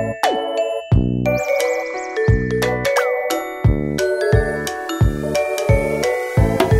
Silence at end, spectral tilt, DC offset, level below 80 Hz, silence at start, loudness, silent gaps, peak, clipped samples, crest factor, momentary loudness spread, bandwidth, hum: 0 s; -6 dB/octave; under 0.1%; -28 dBFS; 0 s; -19 LUFS; none; -2 dBFS; under 0.1%; 16 dB; 5 LU; 16 kHz; none